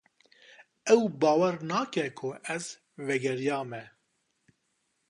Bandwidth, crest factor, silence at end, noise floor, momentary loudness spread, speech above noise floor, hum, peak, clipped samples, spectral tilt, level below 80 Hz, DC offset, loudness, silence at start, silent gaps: 11 kHz; 22 dB; 1.2 s; -77 dBFS; 15 LU; 48 dB; none; -8 dBFS; under 0.1%; -5 dB/octave; -78 dBFS; under 0.1%; -29 LUFS; 0.85 s; none